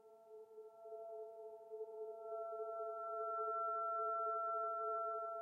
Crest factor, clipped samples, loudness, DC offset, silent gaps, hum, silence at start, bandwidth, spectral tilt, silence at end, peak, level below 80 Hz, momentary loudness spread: 12 dB; under 0.1%; -44 LUFS; under 0.1%; none; none; 0.05 s; 1.5 kHz; -5 dB/octave; 0 s; -32 dBFS; under -90 dBFS; 17 LU